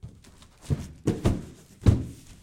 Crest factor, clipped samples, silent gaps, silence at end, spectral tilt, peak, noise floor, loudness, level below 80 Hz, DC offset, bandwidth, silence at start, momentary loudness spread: 22 dB; under 0.1%; none; 0.1 s; -7.5 dB/octave; -6 dBFS; -52 dBFS; -28 LUFS; -38 dBFS; under 0.1%; 14 kHz; 0.05 s; 23 LU